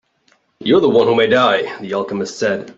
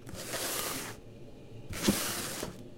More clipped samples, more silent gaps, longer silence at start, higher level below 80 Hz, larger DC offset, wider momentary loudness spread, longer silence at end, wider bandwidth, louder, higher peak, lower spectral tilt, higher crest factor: neither; neither; first, 0.6 s vs 0 s; about the same, -56 dBFS vs -54 dBFS; neither; second, 10 LU vs 20 LU; about the same, 0.05 s vs 0 s; second, 7.8 kHz vs 16.5 kHz; first, -15 LUFS vs -34 LUFS; first, -2 dBFS vs -12 dBFS; first, -5 dB/octave vs -3 dB/octave; second, 14 dB vs 24 dB